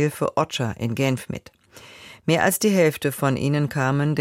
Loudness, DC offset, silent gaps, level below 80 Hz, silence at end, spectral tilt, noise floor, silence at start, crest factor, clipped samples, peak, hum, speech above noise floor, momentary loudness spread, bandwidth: -22 LUFS; under 0.1%; none; -56 dBFS; 0 s; -5.5 dB/octave; -46 dBFS; 0 s; 16 dB; under 0.1%; -6 dBFS; none; 24 dB; 14 LU; 16.5 kHz